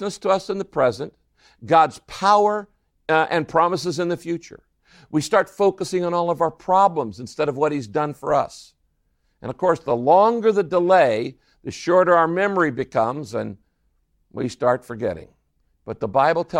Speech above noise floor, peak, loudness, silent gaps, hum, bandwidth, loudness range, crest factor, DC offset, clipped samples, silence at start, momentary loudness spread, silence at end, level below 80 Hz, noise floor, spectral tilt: 47 dB; -2 dBFS; -20 LUFS; none; none; 15 kHz; 6 LU; 18 dB; under 0.1%; under 0.1%; 0 s; 14 LU; 0 s; -58 dBFS; -68 dBFS; -5.5 dB/octave